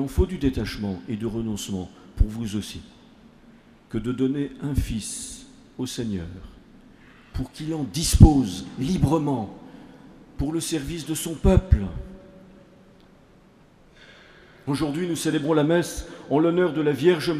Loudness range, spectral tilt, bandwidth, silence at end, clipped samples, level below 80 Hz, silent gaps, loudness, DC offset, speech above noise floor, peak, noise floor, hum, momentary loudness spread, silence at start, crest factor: 9 LU; -6 dB/octave; 15.5 kHz; 0 s; under 0.1%; -32 dBFS; none; -24 LUFS; under 0.1%; 31 dB; 0 dBFS; -54 dBFS; none; 16 LU; 0 s; 24 dB